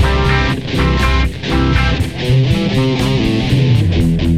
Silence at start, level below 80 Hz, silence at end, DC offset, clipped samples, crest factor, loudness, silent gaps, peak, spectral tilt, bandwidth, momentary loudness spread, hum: 0 s; -20 dBFS; 0 s; 1%; under 0.1%; 12 dB; -14 LUFS; none; -2 dBFS; -6.5 dB/octave; 13 kHz; 3 LU; none